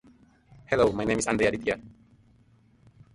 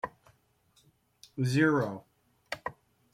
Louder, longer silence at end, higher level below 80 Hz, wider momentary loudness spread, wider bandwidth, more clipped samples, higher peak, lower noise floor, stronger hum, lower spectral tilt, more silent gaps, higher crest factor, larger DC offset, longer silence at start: first, -26 LUFS vs -31 LUFS; first, 1.25 s vs 0.45 s; first, -52 dBFS vs -70 dBFS; second, 7 LU vs 19 LU; second, 11.5 kHz vs 15 kHz; neither; about the same, -10 dBFS vs -12 dBFS; second, -60 dBFS vs -68 dBFS; neither; second, -4.5 dB/octave vs -6.5 dB/octave; neither; about the same, 20 dB vs 22 dB; neither; first, 0.7 s vs 0.05 s